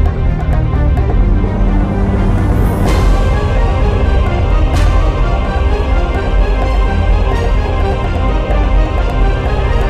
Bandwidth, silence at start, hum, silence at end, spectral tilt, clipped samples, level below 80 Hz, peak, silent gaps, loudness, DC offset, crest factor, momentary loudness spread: 8.4 kHz; 0 s; none; 0 s; -7.5 dB/octave; under 0.1%; -12 dBFS; -2 dBFS; none; -14 LUFS; 0.3%; 8 dB; 3 LU